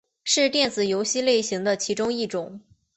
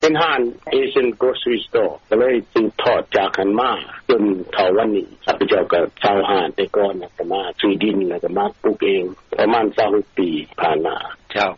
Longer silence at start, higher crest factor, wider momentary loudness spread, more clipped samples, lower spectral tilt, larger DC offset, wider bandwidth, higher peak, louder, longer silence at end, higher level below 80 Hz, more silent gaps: first, 0.25 s vs 0 s; first, 18 dB vs 12 dB; about the same, 8 LU vs 6 LU; neither; about the same, -2.5 dB/octave vs -2.5 dB/octave; neither; first, 8.6 kHz vs 7.2 kHz; about the same, -8 dBFS vs -6 dBFS; second, -23 LUFS vs -19 LUFS; first, 0.35 s vs 0 s; second, -66 dBFS vs -54 dBFS; neither